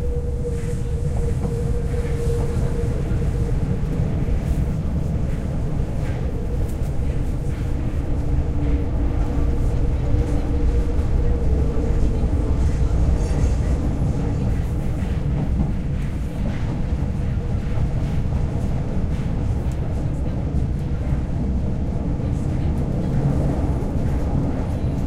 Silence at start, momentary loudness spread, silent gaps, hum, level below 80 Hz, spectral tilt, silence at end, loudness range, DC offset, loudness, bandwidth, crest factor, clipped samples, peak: 0 s; 4 LU; none; none; -22 dBFS; -8.5 dB/octave; 0 s; 3 LU; under 0.1%; -23 LUFS; 11 kHz; 14 dB; under 0.1%; -6 dBFS